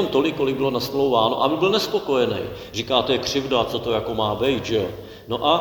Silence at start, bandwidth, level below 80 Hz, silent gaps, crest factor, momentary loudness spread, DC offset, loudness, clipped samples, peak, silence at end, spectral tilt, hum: 0 s; 19.5 kHz; -48 dBFS; none; 20 dB; 9 LU; under 0.1%; -22 LUFS; under 0.1%; -2 dBFS; 0 s; -5 dB/octave; none